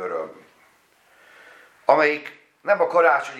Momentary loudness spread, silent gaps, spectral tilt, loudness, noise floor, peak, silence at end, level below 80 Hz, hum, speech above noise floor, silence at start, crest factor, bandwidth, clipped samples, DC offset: 17 LU; none; -4.5 dB/octave; -20 LUFS; -58 dBFS; -2 dBFS; 0 s; -84 dBFS; none; 40 dB; 0 s; 22 dB; 12.5 kHz; under 0.1%; under 0.1%